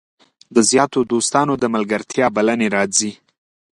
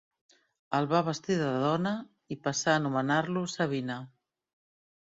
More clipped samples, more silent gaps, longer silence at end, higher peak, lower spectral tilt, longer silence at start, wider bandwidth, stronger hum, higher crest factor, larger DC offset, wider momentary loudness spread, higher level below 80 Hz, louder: neither; neither; second, 0.6 s vs 1 s; first, 0 dBFS vs -12 dBFS; second, -3.5 dB/octave vs -5 dB/octave; second, 0.5 s vs 0.7 s; first, 11.5 kHz vs 7.8 kHz; neither; about the same, 18 dB vs 20 dB; neither; second, 6 LU vs 10 LU; first, -58 dBFS vs -72 dBFS; first, -17 LUFS vs -30 LUFS